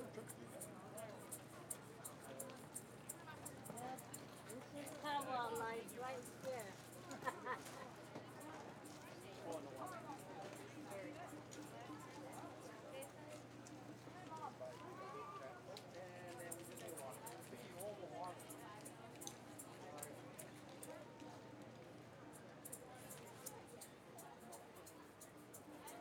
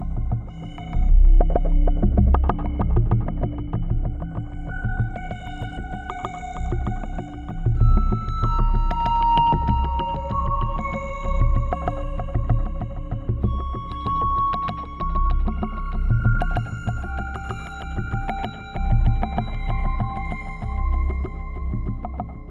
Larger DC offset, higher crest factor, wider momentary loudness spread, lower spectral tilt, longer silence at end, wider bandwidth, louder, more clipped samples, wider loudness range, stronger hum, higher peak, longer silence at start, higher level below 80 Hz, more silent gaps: neither; first, 24 dB vs 18 dB; about the same, 9 LU vs 11 LU; second, -4 dB/octave vs -8.5 dB/octave; about the same, 0 s vs 0 s; first, over 20 kHz vs 7 kHz; second, -53 LUFS vs -25 LUFS; neither; about the same, 8 LU vs 6 LU; neither; second, -28 dBFS vs -4 dBFS; about the same, 0 s vs 0 s; second, -86 dBFS vs -22 dBFS; neither